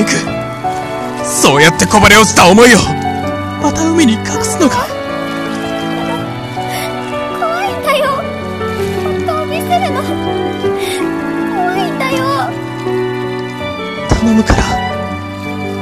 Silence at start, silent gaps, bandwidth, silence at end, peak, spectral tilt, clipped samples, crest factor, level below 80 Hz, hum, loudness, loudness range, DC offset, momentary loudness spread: 0 s; none; 19 kHz; 0 s; 0 dBFS; -4 dB/octave; 0.4%; 12 dB; -30 dBFS; none; -13 LUFS; 8 LU; under 0.1%; 14 LU